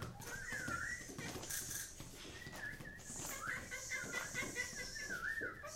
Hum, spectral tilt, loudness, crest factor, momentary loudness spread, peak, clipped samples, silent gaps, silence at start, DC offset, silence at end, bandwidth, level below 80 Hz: none; -2 dB/octave; -44 LUFS; 18 dB; 7 LU; -28 dBFS; under 0.1%; none; 0 s; under 0.1%; 0 s; 16 kHz; -60 dBFS